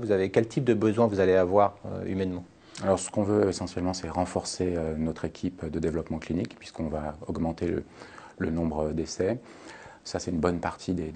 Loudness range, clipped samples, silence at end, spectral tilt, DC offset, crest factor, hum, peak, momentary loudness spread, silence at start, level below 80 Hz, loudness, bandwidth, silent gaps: 6 LU; under 0.1%; 0 s; -6 dB/octave; under 0.1%; 20 dB; none; -8 dBFS; 13 LU; 0 s; -50 dBFS; -28 LUFS; 9.4 kHz; none